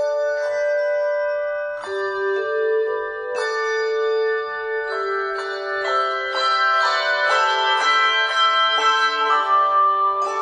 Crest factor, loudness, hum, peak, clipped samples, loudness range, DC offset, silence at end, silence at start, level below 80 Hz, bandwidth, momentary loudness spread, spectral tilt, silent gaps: 14 dB; -19 LUFS; none; -6 dBFS; under 0.1%; 6 LU; under 0.1%; 0 s; 0 s; -64 dBFS; 10.5 kHz; 9 LU; 0 dB/octave; none